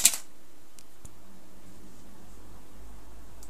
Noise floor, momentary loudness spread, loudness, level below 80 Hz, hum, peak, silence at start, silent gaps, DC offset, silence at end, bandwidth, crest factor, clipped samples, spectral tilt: -58 dBFS; 10 LU; -26 LUFS; -56 dBFS; none; -2 dBFS; 0 s; none; 2%; 0.3 s; 15 kHz; 34 dB; under 0.1%; 0.5 dB/octave